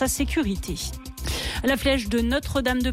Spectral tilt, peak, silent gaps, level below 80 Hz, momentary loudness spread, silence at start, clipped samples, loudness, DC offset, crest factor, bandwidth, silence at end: -4 dB/octave; -12 dBFS; none; -32 dBFS; 8 LU; 0 s; under 0.1%; -25 LUFS; under 0.1%; 14 dB; 16 kHz; 0 s